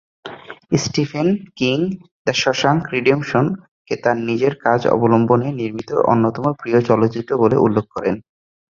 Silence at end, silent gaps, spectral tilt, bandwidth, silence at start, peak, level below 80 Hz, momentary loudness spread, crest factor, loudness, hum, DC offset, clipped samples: 0.55 s; 2.11-2.25 s, 3.71-3.85 s; -6 dB/octave; 7.6 kHz; 0.25 s; -2 dBFS; -52 dBFS; 10 LU; 16 dB; -18 LUFS; none; under 0.1%; under 0.1%